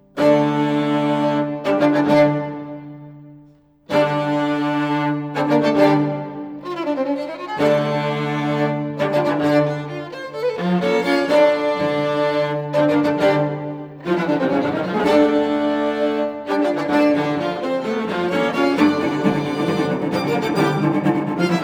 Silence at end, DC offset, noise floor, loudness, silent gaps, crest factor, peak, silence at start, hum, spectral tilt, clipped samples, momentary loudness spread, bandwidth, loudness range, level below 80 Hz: 0 s; under 0.1%; -50 dBFS; -19 LUFS; none; 16 dB; -2 dBFS; 0.15 s; none; -7 dB/octave; under 0.1%; 9 LU; 12.5 kHz; 2 LU; -60 dBFS